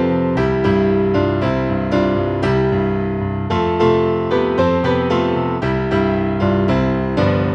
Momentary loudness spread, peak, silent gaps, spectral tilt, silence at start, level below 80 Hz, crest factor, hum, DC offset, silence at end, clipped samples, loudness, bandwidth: 4 LU; -4 dBFS; none; -8.5 dB/octave; 0 s; -34 dBFS; 12 dB; none; under 0.1%; 0 s; under 0.1%; -17 LUFS; 8 kHz